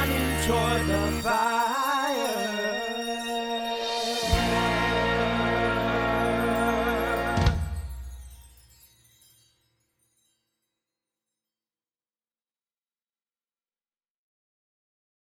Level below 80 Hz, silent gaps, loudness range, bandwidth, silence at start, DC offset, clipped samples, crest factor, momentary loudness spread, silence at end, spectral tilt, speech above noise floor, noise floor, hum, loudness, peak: -40 dBFS; none; 7 LU; over 20 kHz; 0 s; under 0.1%; under 0.1%; 20 dB; 6 LU; 6.85 s; -4.5 dB/octave; over 66 dB; under -90 dBFS; none; -26 LUFS; -10 dBFS